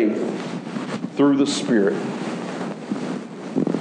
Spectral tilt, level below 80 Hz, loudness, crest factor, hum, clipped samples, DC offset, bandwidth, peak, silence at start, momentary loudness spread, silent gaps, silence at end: -5.5 dB/octave; -78 dBFS; -23 LUFS; 16 dB; none; under 0.1%; under 0.1%; 10 kHz; -6 dBFS; 0 s; 11 LU; none; 0 s